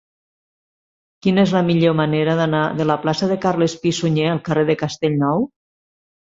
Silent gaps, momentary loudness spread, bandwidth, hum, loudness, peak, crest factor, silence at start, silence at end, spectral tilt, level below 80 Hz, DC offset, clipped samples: none; 4 LU; 7.8 kHz; none; -18 LUFS; -2 dBFS; 16 dB; 1.25 s; 0.8 s; -6.5 dB/octave; -56 dBFS; under 0.1%; under 0.1%